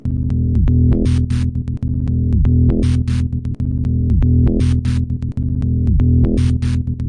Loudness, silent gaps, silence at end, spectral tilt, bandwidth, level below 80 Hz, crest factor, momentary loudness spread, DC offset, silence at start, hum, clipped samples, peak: -17 LUFS; none; 0 s; -9 dB/octave; 9.6 kHz; -22 dBFS; 12 dB; 7 LU; under 0.1%; 0.05 s; none; under 0.1%; -4 dBFS